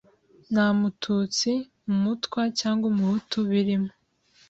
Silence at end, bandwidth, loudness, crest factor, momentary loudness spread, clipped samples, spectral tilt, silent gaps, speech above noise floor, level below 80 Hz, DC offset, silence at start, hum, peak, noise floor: 0.6 s; 8 kHz; -25 LUFS; 16 dB; 5 LU; under 0.1%; -5 dB/octave; none; 37 dB; -64 dBFS; under 0.1%; 0.5 s; none; -10 dBFS; -61 dBFS